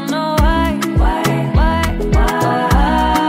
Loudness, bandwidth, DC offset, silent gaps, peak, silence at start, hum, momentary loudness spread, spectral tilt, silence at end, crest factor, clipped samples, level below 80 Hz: -15 LUFS; 16 kHz; under 0.1%; none; -2 dBFS; 0 s; none; 3 LU; -6 dB/octave; 0 s; 12 dB; under 0.1%; -18 dBFS